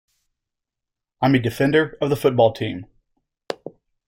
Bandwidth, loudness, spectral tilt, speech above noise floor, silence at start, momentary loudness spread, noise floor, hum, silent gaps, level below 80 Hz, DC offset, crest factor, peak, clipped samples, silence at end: 16.5 kHz; -20 LUFS; -7 dB/octave; 66 dB; 1.2 s; 16 LU; -85 dBFS; none; none; -56 dBFS; under 0.1%; 20 dB; -4 dBFS; under 0.1%; 0.4 s